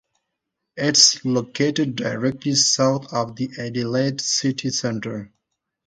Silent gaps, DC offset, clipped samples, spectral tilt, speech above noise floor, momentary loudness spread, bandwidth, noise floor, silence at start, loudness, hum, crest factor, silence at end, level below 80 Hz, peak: none; under 0.1%; under 0.1%; -3 dB/octave; 59 dB; 14 LU; 10.5 kHz; -80 dBFS; 0.75 s; -20 LUFS; none; 22 dB; 0.6 s; -62 dBFS; 0 dBFS